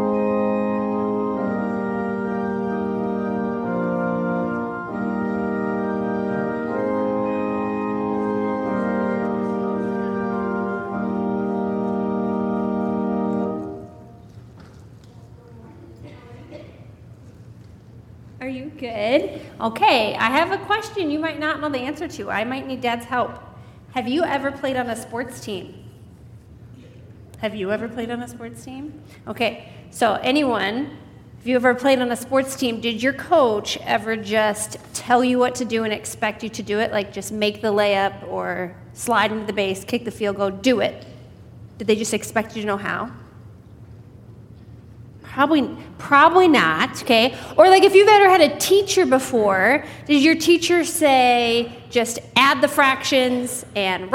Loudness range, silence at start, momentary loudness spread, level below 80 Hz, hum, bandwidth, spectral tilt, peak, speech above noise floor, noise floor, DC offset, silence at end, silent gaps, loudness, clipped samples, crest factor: 14 LU; 0 s; 14 LU; -54 dBFS; none; 16.5 kHz; -4 dB/octave; 0 dBFS; 24 dB; -43 dBFS; under 0.1%; 0 s; none; -20 LUFS; under 0.1%; 20 dB